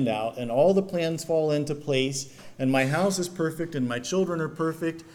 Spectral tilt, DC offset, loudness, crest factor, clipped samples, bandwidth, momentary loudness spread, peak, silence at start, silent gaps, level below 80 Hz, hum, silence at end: -5 dB/octave; under 0.1%; -26 LUFS; 18 dB; under 0.1%; 18.5 kHz; 7 LU; -8 dBFS; 0 s; none; -62 dBFS; none; 0 s